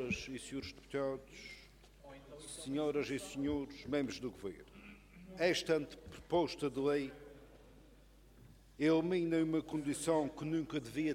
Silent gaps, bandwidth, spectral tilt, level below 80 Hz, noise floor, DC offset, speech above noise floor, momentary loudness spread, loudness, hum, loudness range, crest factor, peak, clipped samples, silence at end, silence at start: none; 16 kHz; -5 dB/octave; -62 dBFS; -62 dBFS; under 0.1%; 25 dB; 21 LU; -38 LUFS; none; 5 LU; 20 dB; -20 dBFS; under 0.1%; 0 s; 0 s